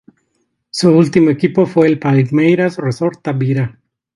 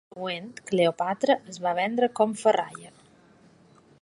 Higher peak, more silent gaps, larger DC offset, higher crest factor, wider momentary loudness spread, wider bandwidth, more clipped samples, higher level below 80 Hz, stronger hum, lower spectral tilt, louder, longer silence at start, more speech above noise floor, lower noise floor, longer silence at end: first, 0 dBFS vs -8 dBFS; neither; neither; about the same, 14 dB vs 18 dB; about the same, 8 LU vs 10 LU; about the same, 11.5 kHz vs 11.5 kHz; neither; first, -56 dBFS vs -74 dBFS; neither; first, -7.5 dB/octave vs -5 dB/octave; first, -14 LUFS vs -26 LUFS; first, 0.75 s vs 0.15 s; first, 54 dB vs 31 dB; first, -66 dBFS vs -57 dBFS; second, 0.45 s vs 1.15 s